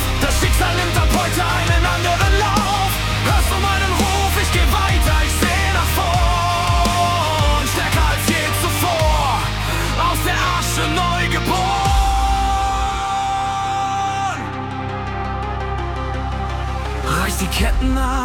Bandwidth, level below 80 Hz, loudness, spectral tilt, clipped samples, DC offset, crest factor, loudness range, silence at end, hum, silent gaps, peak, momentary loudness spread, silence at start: 18 kHz; -22 dBFS; -18 LUFS; -4 dB/octave; under 0.1%; under 0.1%; 14 dB; 6 LU; 0 s; none; none; -4 dBFS; 8 LU; 0 s